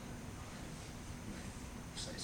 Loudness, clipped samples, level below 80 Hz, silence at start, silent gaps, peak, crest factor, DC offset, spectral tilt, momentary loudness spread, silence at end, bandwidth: -48 LUFS; under 0.1%; -54 dBFS; 0 s; none; -32 dBFS; 16 dB; under 0.1%; -4 dB/octave; 3 LU; 0 s; over 20 kHz